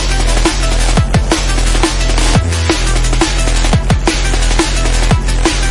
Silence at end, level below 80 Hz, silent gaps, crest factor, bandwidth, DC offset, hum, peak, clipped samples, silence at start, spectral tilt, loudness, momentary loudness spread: 0 s; -14 dBFS; none; 10 dB; 11.5 kHz; under 0.1%; none; 0 dBFS; under 0.1%; 0 s; -4 dB/octave; -13 LUFS; 2 LU